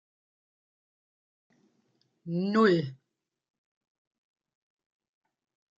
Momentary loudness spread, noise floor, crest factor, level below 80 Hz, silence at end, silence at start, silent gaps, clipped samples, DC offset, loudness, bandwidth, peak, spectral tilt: 18 LU; -84 dBFS; 22 dB; -80 dBFS; 2.85 s; 2.25 s; none; under 0.1%; under 0.1%; -26 LUFS; 7.6 kHz; -12 dBFS; -7.5 dB/octave